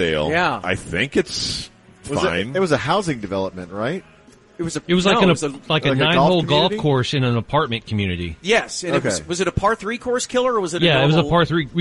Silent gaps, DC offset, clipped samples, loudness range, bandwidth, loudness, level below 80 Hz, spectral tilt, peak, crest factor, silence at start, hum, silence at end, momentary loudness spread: none; under 0.1%; under 0.1%; 5 LU; 11.5 kHz; -19 LUFS; -44 dBFS; -5 dB/octave; -4 dBFS; 16 dB; 0 s; none; 0 s; 10 LU